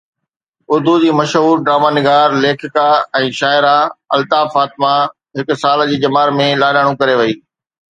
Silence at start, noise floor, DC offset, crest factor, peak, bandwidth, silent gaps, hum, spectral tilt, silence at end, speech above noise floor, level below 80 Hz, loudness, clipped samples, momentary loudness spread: 0.7 s; -72 dBFS; under 0.1%; 14 dB; 0 dBFS; 9.4 kHz; none; none; -5.5 dB/octave; 0.55 s; 60 dB; -62 dBFS; -13 LUFS; under 0.1%; 6 LU